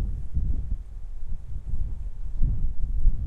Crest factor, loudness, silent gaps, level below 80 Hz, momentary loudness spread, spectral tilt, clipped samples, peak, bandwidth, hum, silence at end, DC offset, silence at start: 16 dB; -34 LUFS; none; -26 dBFS; 11 LU; -9.5 dB/octave; under 0.1%; -8 dBFS; 1 kHz; none; 0 s; under 0.1%; 0 s